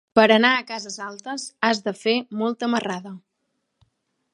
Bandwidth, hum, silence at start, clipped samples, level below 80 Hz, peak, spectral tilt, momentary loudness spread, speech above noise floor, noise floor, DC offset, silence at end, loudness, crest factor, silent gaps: 11 kHz; none; 0.15 s; under 0.1%; -70 dBFS; 0 dBFS; -3.5 dB/octave; 17 LU; 53 dB; -75 dBFS; under 0.1%; 1.15 s; -22 LUFS; 22 dB; none